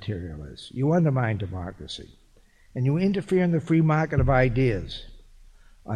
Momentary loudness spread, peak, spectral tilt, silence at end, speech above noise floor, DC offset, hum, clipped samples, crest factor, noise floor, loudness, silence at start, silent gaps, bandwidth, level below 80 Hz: 17 LU; -10 dBFS; -8 dB/octave; 0 s; 32 dB; under 0.1%; none; under 0.1%; 16 dB; -56 dBFS; -24 LUFS; 0 s; none; 10 kHz; -40 dBFS